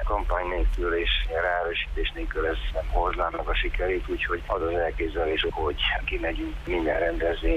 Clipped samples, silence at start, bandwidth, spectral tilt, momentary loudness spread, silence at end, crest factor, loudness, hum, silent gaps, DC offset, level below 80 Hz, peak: under 0.1%; 0 s; 6.4 kHz; -6.5 dB/octave; 4 LU; 0 s; 14 dB; -27 LUFS; none; none; under 0.1%; -30 dBFS; -12 dBFS